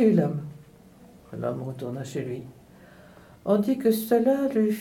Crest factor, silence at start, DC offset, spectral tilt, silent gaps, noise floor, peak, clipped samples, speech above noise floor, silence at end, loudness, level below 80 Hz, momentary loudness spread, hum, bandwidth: 18 dB; 0 s; under 0.1%; -7.5 dB/octave; none; -51 dBFS; -8 dBFS; under 0.1%; 27 dB; 0 s; -26 LUFS; -64 dBFS; 15 LU; none; 19 kHz